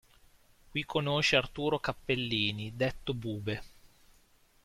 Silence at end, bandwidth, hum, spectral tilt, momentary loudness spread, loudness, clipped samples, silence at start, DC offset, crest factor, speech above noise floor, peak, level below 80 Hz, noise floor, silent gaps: 0.9 s; 15.5 kHz; none; -5 dB/octave; 11 LU; -32 LUFS; under 0.1%; 0.7 s; under 0.1%; 24 dB; 32 dB; -10 dBFS; -56 dBFS; -64 dBFS; none